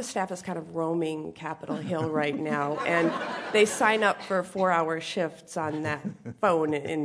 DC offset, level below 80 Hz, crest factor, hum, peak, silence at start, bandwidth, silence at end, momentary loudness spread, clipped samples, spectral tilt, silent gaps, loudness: under 0.1%; -70 dBFS; 20 dB; none; -8 dBFS; 0 s; 11 kHz; 0 s; 11 LU; under 0.1%; -4.5 dB/octave; none; -28 LUFS